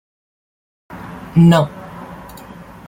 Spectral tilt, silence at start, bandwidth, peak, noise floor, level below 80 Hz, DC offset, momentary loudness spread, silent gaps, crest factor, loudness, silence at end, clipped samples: -8 dB/octave; 0.9 s; 16 kHz; -2 dBFS; -37 dBFS; -46 dBFS; under 0.1%; 25 LU; none; 18 dB; -14 LUFS; 0.7 s; under 0.1%